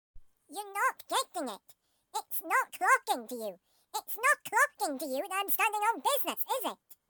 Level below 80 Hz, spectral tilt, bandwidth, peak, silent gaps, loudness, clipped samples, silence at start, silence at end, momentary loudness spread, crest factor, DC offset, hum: -70 dBFS; 0 dB/octave; 19.5 kHz; -14 dBFS; none; -31 LUFS; under 0.1%; 0.15 s; 0.15 s; 14 LU; 20 dB; under 0.1%; none